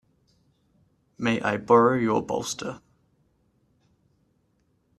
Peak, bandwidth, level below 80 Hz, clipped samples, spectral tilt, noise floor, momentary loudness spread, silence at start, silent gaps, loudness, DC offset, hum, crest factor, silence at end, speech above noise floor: -6 dBFS; 13 kHz; -64 dBFS; under 0.1%; -5 dB/octave; -69 dBFS; 15 LU; 1.2 s; none; -24 LUFS; under 0.1%; none; 22 dB; 2.2 s; 46 dB